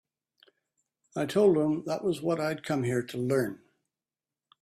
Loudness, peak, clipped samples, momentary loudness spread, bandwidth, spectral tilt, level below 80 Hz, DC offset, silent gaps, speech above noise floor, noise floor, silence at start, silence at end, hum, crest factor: -29 LUFS; -12 dBFS; under 0.1%; 11 LU; 15 kHz; -6.5 dB/octave; -70 dBFS; under 0.1%; none; over 62 dB; under -90 dBFS; 1.15 s; 1.05 s; none; 18 dB